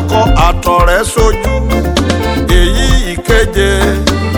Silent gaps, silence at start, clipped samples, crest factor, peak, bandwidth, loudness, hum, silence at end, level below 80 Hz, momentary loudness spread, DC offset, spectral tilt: none; 0 s; 0.6%; 10 dB; 0 dBFS; 19 kHz; -11 LUFS; none; 0 s; -14 dBFS; 4 LU; under 0.1%; -5 dB/octave